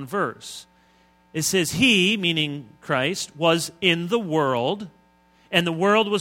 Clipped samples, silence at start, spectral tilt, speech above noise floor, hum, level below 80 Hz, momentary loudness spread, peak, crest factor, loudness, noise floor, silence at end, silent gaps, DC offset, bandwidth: under 0.1%; 0 s; -3.5 dB/octave; 36 dB; none; -60 dBFS; 16 LU; -2 dBFS; 22 dB; -21 LUFS; -58 dBFS; 0 s; none; under 0.1%; 16.5 kHz